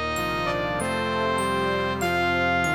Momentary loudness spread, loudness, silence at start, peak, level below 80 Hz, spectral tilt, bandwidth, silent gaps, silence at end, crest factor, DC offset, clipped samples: 4 LU; -24 LUFS; 0 s; -10 dBFS; -46 dBFS; -4.5 dB/octave; 17 kHz; none; 0 s; 14 dB; 0.3%; under 0.1%